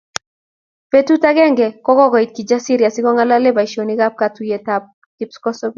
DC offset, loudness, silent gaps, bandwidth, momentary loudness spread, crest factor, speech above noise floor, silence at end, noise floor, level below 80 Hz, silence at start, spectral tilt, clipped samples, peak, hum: under 0.1%; -15 LUFS; 4.93-5.18 s; 7.6 kHz; 11 LU; 16 dB; over 76 dB; 0.05 s; under -90 dBFS; -62 dBFS; 0.95 s; -4.5 dB/octave; under 0.1%; 0 dBFS; none